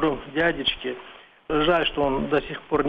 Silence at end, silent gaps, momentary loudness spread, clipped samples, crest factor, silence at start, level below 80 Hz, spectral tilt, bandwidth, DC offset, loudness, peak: 0 s; none; 10 LU; under 0.1%; 16 dB; 0 s; -42 dBFS; -7 dB/octave; 5.6 kHz; under 0.1%; -24 LUFS; -8 dBFS